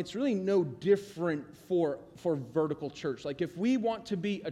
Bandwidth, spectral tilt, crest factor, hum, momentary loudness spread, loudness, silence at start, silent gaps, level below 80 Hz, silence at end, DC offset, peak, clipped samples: 13 kHz; -7 dB/octave; 16 dB; none; 7 LU; -32 LUFS; 0 s; none; -68 dBFS; 0 s; under 0.1%; -14 dBFS; under 0.1%